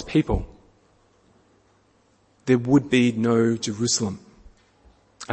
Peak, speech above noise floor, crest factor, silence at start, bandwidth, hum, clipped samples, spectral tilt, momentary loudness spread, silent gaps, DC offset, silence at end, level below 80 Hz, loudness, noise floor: -6 dBFS; 41 dB; 20 dB; 0 s; 8.8 kHz; none; under 0.1%; -5 dB/octave; 18 LU; none; under 0.1%; 0 s; -42 dBFS; -22 LUFS; -62 dBFS